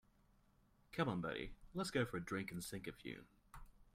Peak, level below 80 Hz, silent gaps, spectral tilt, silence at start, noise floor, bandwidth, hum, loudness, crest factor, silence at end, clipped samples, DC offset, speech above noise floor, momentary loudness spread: -26 dBFS; -64 dBFS; none; -5 dB/octave; 0.9 s; -73 dBFS; 16 kHz; none; -45 LUFS; 20 dB; 0.05 s; under 0.1%; under 0.1%; 29 dB; 22 LU